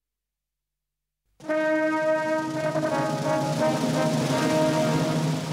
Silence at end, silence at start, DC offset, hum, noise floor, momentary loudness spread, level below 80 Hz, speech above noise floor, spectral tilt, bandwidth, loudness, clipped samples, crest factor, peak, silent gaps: 0 s; 1.4 s; under 0.1%; 50 Hz at -60 dBFS; -87 dBFS; 4 LU; -64 dBFS; 64 dB; -5.5 dB/octave; 16 kHz; -24 LUFS; under 0.1%; 16 dB; -10 dBFS; none